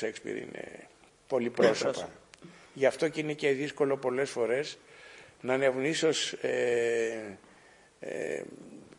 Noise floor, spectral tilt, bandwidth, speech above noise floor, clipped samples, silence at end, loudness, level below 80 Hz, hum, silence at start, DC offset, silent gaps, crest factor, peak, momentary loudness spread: -59 dBFS; -4 dB/octave; 11 kHz; 28 dB; under 0.1%; 0.05 s; -30 LUFS; -74 dBFS; none; 0 s; under 0.1%; none; 20 dB; -12 dBFS; 19 LU